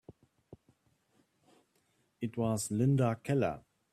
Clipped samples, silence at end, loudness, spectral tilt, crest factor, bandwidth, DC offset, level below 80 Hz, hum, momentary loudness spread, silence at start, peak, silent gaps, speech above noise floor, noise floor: under 0.1%; 0.35 s; -32 LUFS; -6.5 dB/octave; 18 dB; 14.5 kHz; under 0.1%; -68 dBFS; none; 12 LU; 2.2 s; -18 dBFS; none; 44 dB; -75 dBFS